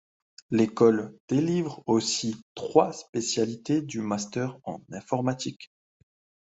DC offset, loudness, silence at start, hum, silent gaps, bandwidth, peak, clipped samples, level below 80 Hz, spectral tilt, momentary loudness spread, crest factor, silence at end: under 0.1%; -27 LUFS; 0.5 s; none; 1.20-1.28 s, 2.42-2.55 s, 3.09-3.13 s; 8.2 kHz; -4 dBFS; under 0.1%; -68 dBFS; -5 dB/octave; 12 LU; 22 dB; 0.85 s